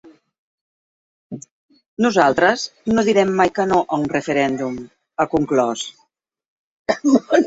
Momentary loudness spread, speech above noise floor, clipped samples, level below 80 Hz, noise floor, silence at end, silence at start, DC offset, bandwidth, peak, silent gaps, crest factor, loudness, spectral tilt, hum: 18 LU; 47 dB; under 0.1%; -54 dBFS; -64 dBFS; 0 s; 1.3 s; under 0.1%; 8 kHz; -2 dBFS; 1.51-1.69 s, 1.86-1.97 s, 6.48-6.85 s; 18 dB; -18 LUFS; -5 dB/octave; none